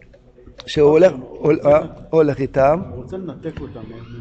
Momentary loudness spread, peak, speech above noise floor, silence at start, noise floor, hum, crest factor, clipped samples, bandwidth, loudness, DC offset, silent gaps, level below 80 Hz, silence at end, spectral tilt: 20 LU; -4 dBFS; 28 dB; 0.6 s; -45 dBFS; none; 14 dB; under 0.1%; 8.2 kHz; -16 LUFS; under 0.1%; none; -44 dBFS; 0 s; -7.5 dB/octave